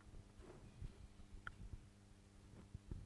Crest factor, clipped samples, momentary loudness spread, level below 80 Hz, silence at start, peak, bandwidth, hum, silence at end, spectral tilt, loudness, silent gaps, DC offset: 24 dB; under 0.1%; 9 LU; -60 dBFS; 0 s; -32 dBFS; 11.5 kHz; none; 0 s; -6 dB/octave; -60 LUFS; none; under 0.1%